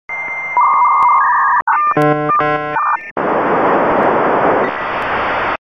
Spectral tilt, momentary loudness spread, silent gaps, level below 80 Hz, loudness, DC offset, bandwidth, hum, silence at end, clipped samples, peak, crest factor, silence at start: -7 dB/octave; 7 LU; 1.62-1.66 s, 3.11-3.16 s; -46 dBFS; -13 LUFS; 0.2%; 9.4 kHz; none; 0.1 s; under 0.1%; -2 dBFS; 12 dB; 0.1 s